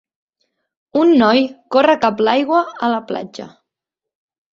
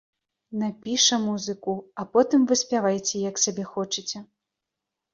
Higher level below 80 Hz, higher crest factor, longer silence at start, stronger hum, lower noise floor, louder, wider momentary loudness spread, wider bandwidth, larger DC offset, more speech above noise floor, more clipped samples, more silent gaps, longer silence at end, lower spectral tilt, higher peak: first, -62 dBFS vs -70 dBFS; about the same, 16 dB vs 20 dB; first, 0.95 s vs 0.5 s; neither; about the same, -84 dBFS vs -85 dBFS; first, -15 LUFS vs -24 LUFS; first, 14 LU vs 11 LU; about the same, 7.4 kHz vs 7.8 kHz; neither; first, 69 dB vs 61 dB; neither; neither; first, 1.05 s vs 0.9 s; first, -5.5 dB/octave vs -3 dB/octave; first, -2 dBFS vs -6 dBFS